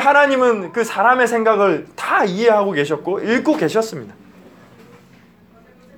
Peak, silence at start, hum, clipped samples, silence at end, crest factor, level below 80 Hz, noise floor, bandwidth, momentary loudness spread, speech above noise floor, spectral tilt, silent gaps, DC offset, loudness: 0 dBFS; 0 s; none; under 0.1%; 1.85 s; 16 dB; -66 dBFS; -48 dBFS; 18 kHz; 8 LU; 32 dB; -5 dB/octave; none; under 0.1%; -16 LUFS